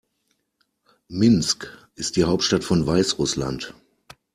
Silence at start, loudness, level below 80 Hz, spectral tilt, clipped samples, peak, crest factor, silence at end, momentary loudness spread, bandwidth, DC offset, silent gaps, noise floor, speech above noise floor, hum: 1.1 s; -21 LUFS; -48 dBFS; -4.5 dB/octave; under 0.1%; -6 dBFS; 18 dB; 0.65 s; 15 LU; 14 kHz; under 0.1%; none; -72 dBFS; 51 dB; none